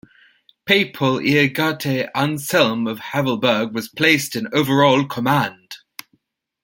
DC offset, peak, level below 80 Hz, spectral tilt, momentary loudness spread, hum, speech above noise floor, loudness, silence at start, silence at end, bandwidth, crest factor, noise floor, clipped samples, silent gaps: under 0.1%; -2 dBFS; -60 dBFS; -5 dB/octave; 14 LU; none; 47 dB; -18 LUFS; 0.65 s; 0.85 s; 17 kHz; 18 dB; -65 dBFS; under 0.1%; none